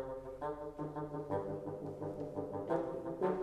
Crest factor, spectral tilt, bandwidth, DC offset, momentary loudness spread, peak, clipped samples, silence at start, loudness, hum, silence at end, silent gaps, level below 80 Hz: 20 dB; -9 dB/octave; 13 kHz; under 0.1%; 6 LU; -20 dBFS; under 0.1%; 0 s; -41 LUFS; none; 0 s; none; -64 dBFS